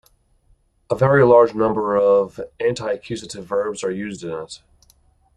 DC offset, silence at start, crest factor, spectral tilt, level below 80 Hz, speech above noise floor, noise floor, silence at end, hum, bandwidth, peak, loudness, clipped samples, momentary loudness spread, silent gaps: under 0.1%; 0.9 s; 18 dB; -6.5 dB/octave; -54 dBFS; 41 dB; -59 dBFS; 0.8 s; none; 11 kHz; -2 dBFS; -19 LUFS; under 0.1%; 17 LU; none